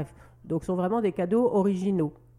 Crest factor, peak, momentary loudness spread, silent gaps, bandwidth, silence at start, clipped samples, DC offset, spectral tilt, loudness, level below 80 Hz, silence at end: 12 dB; -14 dBFS; 9 LU; none; 11 kHz; 0 s; under 0.1%; under 0.1%; -8.5 dB/octave; -26 LUFS; -58 dBFS; 0.25 s